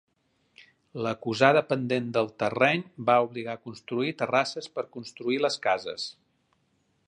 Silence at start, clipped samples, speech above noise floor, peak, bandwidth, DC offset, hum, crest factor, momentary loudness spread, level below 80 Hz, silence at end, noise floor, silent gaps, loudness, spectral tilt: 0.95 s; under 0.1%; 44 dB; -4 dBFS; 10.5 kHz; under 0.1%; none; 26 dB; 13 LU; -72 dBFS; 0.95 s; -71 dBFS; none; -27 LUFS; -5 dB/octave